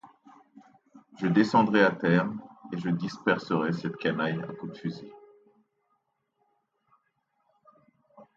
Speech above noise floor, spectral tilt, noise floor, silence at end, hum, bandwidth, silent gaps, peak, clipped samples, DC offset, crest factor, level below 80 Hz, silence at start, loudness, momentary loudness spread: 49 dB; -7.5 dB/octave; -76 dBFS; 0.15 s; none; 7.8 kHz; none; -8 dBFS; under 0.1%; under 0.1%; 22 dB; -72 dBFS; 0.05 s; -27 LUFS; 16 LU